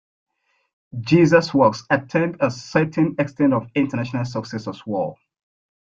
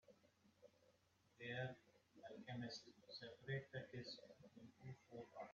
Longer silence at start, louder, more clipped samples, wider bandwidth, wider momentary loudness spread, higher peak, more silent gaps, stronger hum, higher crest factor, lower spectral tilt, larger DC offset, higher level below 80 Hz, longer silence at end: first, 0.95 s vs 0.05 s; first, -20 LUFS vs -54 LUFS; neither; about the same, 7.4 kHz vs 7.2 kHz; about the same, 14 LU vs 14 LU; first, -2 dBFS vs -36 dBFS; neither; neither; about the same, 18 dB vs 20 dB; first, -7 dB/octave vs -4 dB/octave; neither; first, -58 dBFS vs -86 dBFS; first, 0.75 s vs 0 s